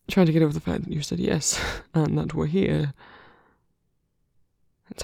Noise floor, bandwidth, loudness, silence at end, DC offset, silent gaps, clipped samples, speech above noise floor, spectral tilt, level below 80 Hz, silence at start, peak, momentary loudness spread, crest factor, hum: -71 dBFS; 16 kHz; -24 LUFS; 0 s; under 0.1%; none; under 0.1%; 48 dB; -5.5 dB/octave; -46 dBFS; 0.1 s; -6 dBFS; 8 LU; 20 dB; none